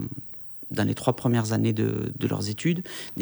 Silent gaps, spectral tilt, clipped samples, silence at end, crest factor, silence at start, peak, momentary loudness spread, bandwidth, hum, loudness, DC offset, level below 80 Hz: none; -6.5 dB/octave; under 0.1%; 0 s; 18 dB; 0 s; -8 dBFS; 11 LU; over 20 kHz; none; -27 LUFS; under 0.1%; -58 dBFS